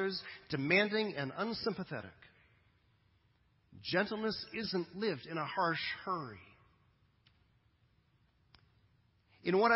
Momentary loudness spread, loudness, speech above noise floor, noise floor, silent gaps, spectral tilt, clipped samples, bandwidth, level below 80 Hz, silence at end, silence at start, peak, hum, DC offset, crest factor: 14 LU; -36 LUFS; 37 dB; -72 dBFS; none; -8.5 dB/octave; under 0.1%; 5.8 kHz; -72 dBFS; 0 s; 0 s; -16 dBFS; none; under 0.1%; 22 dB